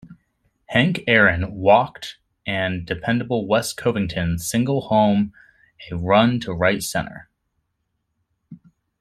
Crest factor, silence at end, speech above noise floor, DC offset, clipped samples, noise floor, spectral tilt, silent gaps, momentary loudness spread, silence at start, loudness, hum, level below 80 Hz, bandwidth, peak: 20 dB; 0.45 s; 54 dB; under 0.1%; under 0.1%; -74 dBFS; -5 dB/octave; none; 12 LU; 0.05 s; -20 LUFS; none; -48 dBFS; 16 kHz; -2 dBFS